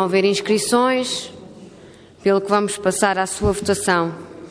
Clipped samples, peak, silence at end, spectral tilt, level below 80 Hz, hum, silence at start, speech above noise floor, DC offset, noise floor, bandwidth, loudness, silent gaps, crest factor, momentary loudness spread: under 0.1%; -4 dBFS; 0 s; -4 dB/octave; -44 dBFS; none; 0 s; 25 dB; under 0.1%; -44 dBFS; 11 kHz; -19 LUFS; none; 16 dB; 10 LU